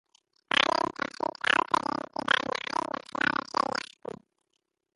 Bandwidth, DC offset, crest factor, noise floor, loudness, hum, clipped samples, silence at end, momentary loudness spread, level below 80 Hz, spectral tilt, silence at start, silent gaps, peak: 11.5 kHz; under 0.1%; 26 dB; -80 dBFS; -28 LUFS; none; under 0.1%; 1.15 s; 11 LU; -68 dBFS; -2.5 dB/octave; 0.55 s; none; -6 dBFS